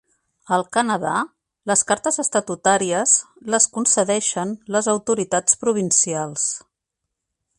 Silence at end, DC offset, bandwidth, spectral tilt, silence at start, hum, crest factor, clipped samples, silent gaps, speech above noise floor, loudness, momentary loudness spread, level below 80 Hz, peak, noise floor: 1 s; under 0.1%; 11.5 kHz; -2.5 dB/octave; 0.5 s; none; 20 dB; under 0.1%; none; 61 dB; -19 LUFS; 7 LU; -64 dBFS; 0 dBFS; -81 dBFS